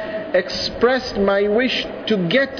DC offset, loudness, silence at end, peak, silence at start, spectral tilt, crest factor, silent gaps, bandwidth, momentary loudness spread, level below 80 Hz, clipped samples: under 0.1%; -19 LUFS; 0 s; -4 dBFS; 0 s; -5 dB/octave; 14 dB; none; 5.4 kHz; 5 LU; -46 dBFS; under 0.1%